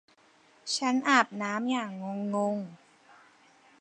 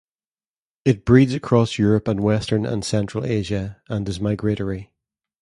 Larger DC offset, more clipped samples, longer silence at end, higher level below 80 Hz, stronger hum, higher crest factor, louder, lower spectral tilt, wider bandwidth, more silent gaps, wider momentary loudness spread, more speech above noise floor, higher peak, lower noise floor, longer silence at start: neither; neither; first, 1.05 s vs 0.6 s; second, -86 dBFS vs -44 dBFS; neither; about the same, 24 dB vs 20 dB; second, -29 LUFS vs -21 LUFS; second, -3.5 dB/octave vs -7 dB/octave; about the same, 10.5 kHz vs 11.5 kHz; neither; about the same, 13 LU vs 12 LU; second, 33 dB vs over 70 dB; second, -8 dBFS vs 0 dBFS; second, -62 dBFS vs under -90 dBFS; second, 0.65 s vs 0.85 s